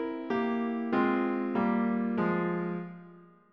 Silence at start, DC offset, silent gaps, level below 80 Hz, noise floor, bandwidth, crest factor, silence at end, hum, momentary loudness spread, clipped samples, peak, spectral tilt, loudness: 0 s; under 0.1%; none; -70 dBFS; -53 dBFS; 5.6 kHz; 14 dB; 0.3 s; none; 8 LU; under 0.1%; -16 dBFS; -9.5 dB/octave; -30 LUFS